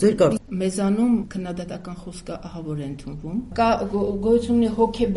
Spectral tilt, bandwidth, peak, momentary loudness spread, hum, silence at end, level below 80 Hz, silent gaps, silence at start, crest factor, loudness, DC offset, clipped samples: -6.5 dB/octave; 11.5 kHz; -6 dBFS; 15 LU; none; 0 s; -42 dBFS; none; 0 s; 18 dB; -23 LUFS; under 0.1%; under 0.1%